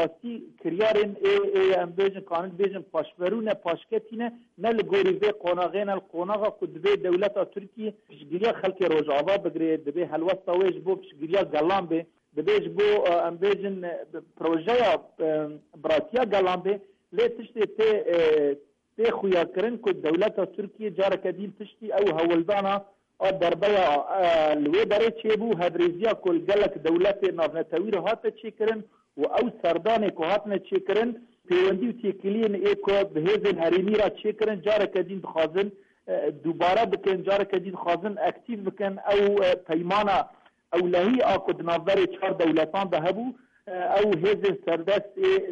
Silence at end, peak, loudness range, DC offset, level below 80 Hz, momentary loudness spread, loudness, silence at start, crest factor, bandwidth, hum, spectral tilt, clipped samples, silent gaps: 0 s; -14 dBFS; 3 LU; under 0.1%; -62 dBFS; 9 LU; -25 LUFS; 0 s; 12 dB; 7.4 kHz; none; -6.5 dB/octave; under 0.1%; none